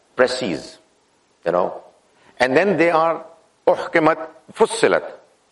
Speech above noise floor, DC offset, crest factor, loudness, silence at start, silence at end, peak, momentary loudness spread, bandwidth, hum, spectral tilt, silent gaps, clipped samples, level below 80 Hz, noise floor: 42 dB; under 0.1%; 20 dB; -19 LUFS; 0.15 s; 0.35 s; -2 dBFS; 14 LU; 11.5 kHz; none; -4.5 dB/octave; none; under 0.1%; -60 dBFS; -60 dBFS